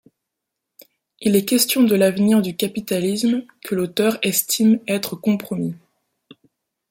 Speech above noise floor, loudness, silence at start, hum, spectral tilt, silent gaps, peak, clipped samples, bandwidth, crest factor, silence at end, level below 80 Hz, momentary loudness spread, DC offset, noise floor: 62 dB; -19 LUFS; 1.2 s; none; -4.5 dB/octave; none; -2 dBFS; under 0.1%; 16.5 kHz; 18 dB; 1.15 s; -64 dBFS; 10 LU; under 0.1%; -81 dBFS